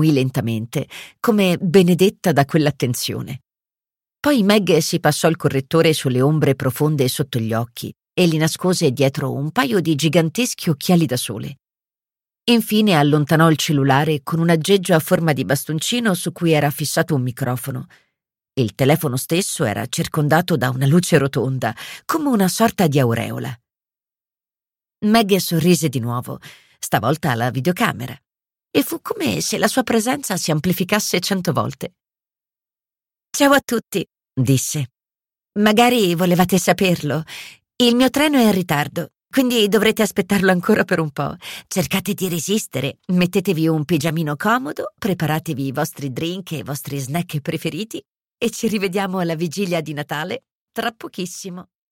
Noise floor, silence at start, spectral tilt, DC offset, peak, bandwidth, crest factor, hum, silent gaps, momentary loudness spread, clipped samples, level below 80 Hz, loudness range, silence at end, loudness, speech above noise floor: under -90 dBFS; 0 s; -5 dB/octave; under 0.1%; -2 dBFS; 17 kHz; 18 dB; none; 50.52-50.67 s; 12 LU; under 0.1%; -54 dBFS; 6 LU; 0.3 s; -18 LUFS; over 72 dB